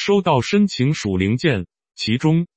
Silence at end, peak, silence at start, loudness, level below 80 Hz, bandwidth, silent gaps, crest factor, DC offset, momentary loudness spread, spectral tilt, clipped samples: 0.1 s; -2 dBFS; 0 s; -19 LUFS; -50 dBFS; 8.6 kHz; none; 16 dB; under 0.1%; 8 LU; -6 dB/octave; under 0.1%